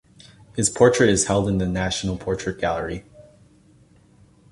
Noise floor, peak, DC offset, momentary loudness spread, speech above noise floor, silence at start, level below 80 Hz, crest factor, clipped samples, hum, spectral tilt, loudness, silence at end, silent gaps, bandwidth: -54 dBFS; -2 dBFS; under 0.1%; 13 LU; 33 dB; 0.55 s; -42 dBFS; 22 dB; under 0.1%; none; -4.5 dB/octave; -21 LUFS; 1.5 s; none; 11.5 kHz